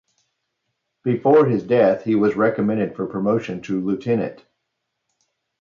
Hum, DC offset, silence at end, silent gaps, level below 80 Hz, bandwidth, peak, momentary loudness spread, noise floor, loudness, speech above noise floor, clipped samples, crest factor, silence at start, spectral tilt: none; under 0.1%; 1.25 s; none; -62 dBFS; 7.2 kHz; -4 dBFS; 9 LU; -77 dBFS; -20 LUFS; 58 dB; under 0.1%; 16 dB; 1.05 s; -8.5 dB/octave